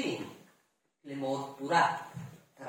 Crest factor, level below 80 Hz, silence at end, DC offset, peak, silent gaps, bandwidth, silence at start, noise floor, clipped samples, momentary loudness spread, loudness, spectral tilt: 22 dB; -82 dBFS; 0 s; under 0.1%; -14 dBFS; none; 17 kHz; 0 s; -74 dBFS; under 0.1%; 19 LU; -32 LUFS; -4.5 dB/octave